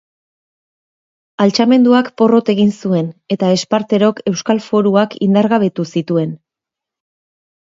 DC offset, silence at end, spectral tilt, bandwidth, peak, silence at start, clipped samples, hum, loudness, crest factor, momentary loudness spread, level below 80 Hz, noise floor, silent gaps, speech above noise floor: under 0.1%; 1.4 s; -6.5 dB/octave; 7.8 kHz; 0 dBFS; 1.4 s; under 0.1%; none; -14 LUFS; 14 dB; 7 LU; -64 dBFS; -84 dBFS; none; 71 dB